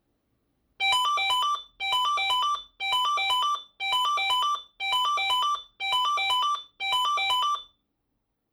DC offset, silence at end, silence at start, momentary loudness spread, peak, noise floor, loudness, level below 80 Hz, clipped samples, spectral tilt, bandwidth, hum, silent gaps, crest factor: under 0.1%; 0.9 s; 0.8 s; 5 LU; -14 dBFS; -78 dBFS; -25 LUFS; -70 dBFS; under 0.1%; 2.5 dB/octave; 16 kHz; none; none; 14 dB